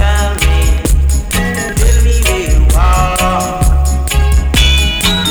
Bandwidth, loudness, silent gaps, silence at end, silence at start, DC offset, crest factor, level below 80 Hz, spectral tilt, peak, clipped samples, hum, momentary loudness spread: over 20 kHz; -12 LUFS; none; 0 s; 0 s; under 0.1%; 8 dB; -10 dBFS; -4 dB/octave; -2 dBFS; under 0.1%; none; 4 LU